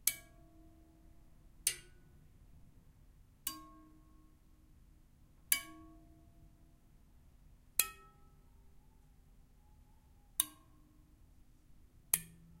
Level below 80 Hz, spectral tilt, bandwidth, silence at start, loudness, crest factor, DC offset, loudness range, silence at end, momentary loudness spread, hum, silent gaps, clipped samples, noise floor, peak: -64 dBFS; 0 dB/octave; 16 kHz; 0.05 s; -37 LUFS; 38 dB; under 0.1%; 6 LU; 0.15 s; 26 LU; none; none; under 0.1%; -64 dBFS; -8 dBFS